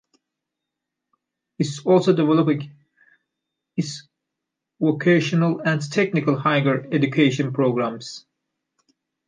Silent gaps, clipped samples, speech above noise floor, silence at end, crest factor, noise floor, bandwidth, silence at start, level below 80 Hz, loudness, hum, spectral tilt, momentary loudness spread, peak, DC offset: none; under 0.1%; 63 dB; 1.1 s; 20 dB; -83 dBFS; 9.8 kHz; 1.6 s; -70 dBFS; -21 LUFS; none; -6.5 dB/octave; 13 LU; -4 dBFS; under 0.1%